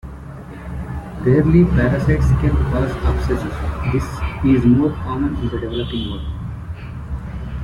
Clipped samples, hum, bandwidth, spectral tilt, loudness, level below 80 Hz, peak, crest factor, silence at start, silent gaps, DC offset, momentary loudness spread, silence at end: under 0.1%; none; 12 kHz; -8.5 dB/octave; -19 LUFS; -26 dBFS; -2 dBFS; 16 dB; 0.05 s; none; under 0.1%; 17 LU; 0 s